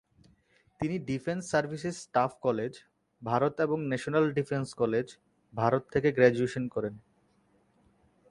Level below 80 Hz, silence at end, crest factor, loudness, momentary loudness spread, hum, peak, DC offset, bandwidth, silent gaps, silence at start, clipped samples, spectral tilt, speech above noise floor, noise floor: -64 dBFS; 1.3 s; 24 dB; -30 LUFS; 12 LU; none; -8 dBFS; under 0.1%; 11.5 kHz; none; 0.8 s; under 0.1%; -6.5 dB/octave; 39 dB; -68 dBFS